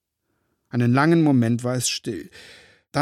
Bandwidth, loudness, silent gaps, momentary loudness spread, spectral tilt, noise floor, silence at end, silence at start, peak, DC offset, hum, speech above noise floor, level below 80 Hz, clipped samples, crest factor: 15 kHz; -21 LUFS; none; 15 LU; -5.5 dB/octave; -74 dBFS; 0 s; 0.75 s; -6 dBFS; under 0.1%; none; 53 dB; -64 dBFS; under 0.1%; 18 dB